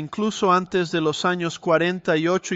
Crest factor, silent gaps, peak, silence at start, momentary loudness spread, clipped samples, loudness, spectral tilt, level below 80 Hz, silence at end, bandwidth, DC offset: 16 dB; none; -6 dBFS; 0 s; 4 LU; under 0.1%; -21 LUFS; -5 dB/octave; -62 dBFS; 0 s; 8 kHz; under 0.1%